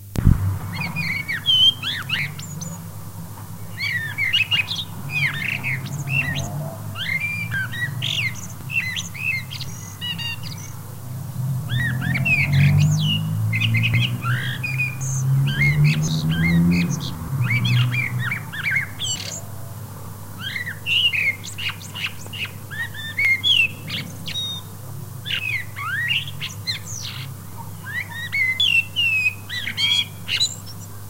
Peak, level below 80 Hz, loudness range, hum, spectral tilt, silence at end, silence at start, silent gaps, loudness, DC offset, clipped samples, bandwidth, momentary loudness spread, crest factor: 0 dBFS; -40 dBFS; 6 LU; none; -3.5 dB/octave; 0 s; 0 s; none; -21 LUFS; 0.8%; under 0.1%; 16 kHz; 16 LU; 22 dB